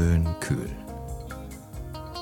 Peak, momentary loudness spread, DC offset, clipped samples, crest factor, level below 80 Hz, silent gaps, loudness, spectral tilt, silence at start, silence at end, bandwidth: -12 dBFS; 15 LU; under 0.1%; under 0.1%; 16 dB; -36 dBFS; none; -31 LUFS; -6.5 dB/octave; 0 s; 0 s; 17 kHz